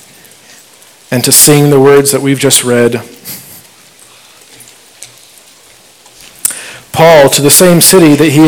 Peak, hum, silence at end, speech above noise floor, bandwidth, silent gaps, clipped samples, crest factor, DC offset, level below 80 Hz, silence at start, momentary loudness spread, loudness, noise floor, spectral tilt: 0 dBFS; none; 0 s; 34 dB; over 20 kHz; none; 7%; 8 dB; under 0.1%; -44 dBFS; 1.1 s; 18 LU; -5 LUFS; -40 dBFS; -3.5 dB/octave